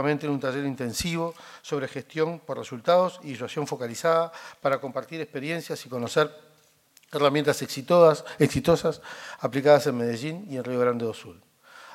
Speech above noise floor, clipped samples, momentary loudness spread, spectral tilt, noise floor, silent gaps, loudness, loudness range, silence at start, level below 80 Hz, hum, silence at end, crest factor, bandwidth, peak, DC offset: 36 dB; under 0.1%; 14 LU; -5.5 dB/octave; -61 dBFS; none; -26 LUFS; 6 LU; 0 s; -58 dBFS; none; 0 s; 22 dB; 16 kHz; -4 dBFS; under 0.1%